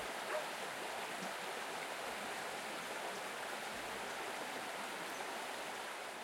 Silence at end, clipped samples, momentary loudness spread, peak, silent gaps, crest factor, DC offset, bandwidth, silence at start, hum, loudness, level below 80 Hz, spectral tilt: 0 s; under 0.1%; 2 LU; -28 dBFS; none; 16 dB; under 0.1%; 16.5 kHz; 0 s; none; -43 LUFS; -78 dBFS; -1.5 dB/octave